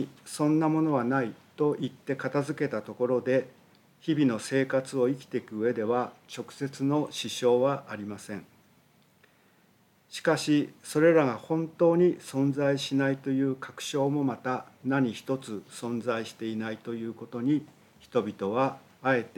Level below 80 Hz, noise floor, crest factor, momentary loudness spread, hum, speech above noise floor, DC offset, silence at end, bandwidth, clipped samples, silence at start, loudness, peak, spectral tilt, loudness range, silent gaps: -82 dBFS; -64 dBFS; 18 dB; 12 LU; none; 36 dB; under 0.1%; 0.1 s; 16.5 kHz; under 0.1%; 0 s; -29 LUFS; -10 dBFS; -6 dB/octave; 6 LU; none